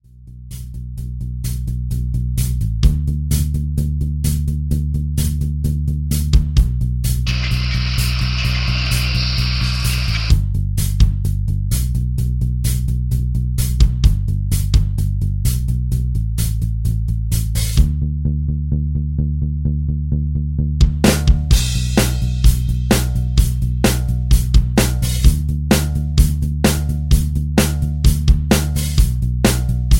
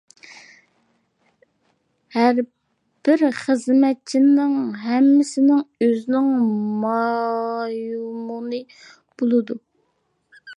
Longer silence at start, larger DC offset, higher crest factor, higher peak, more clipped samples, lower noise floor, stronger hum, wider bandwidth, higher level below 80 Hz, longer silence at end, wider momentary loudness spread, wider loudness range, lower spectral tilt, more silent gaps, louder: about the same, 0.2 s vs 0.3 s; neither; about the same, 16 dB vs 16 dB; first, 0 dBFS vs -4 dBFS; neither; second, -37 dBFS vs -69 dBFS; neither; first, 17 kHz vs 10.5 kHz; first, -18 dBFS vs -78 dBFS; about the same, 0 s vs 0.05 s; second, 5 LU vs 13 LU; second, 3 LU vs 7 LU; about the same, -5.5 dB/octave vs -6 dB/octave; neither; about the same, -18 LUFS vs -20 LUFS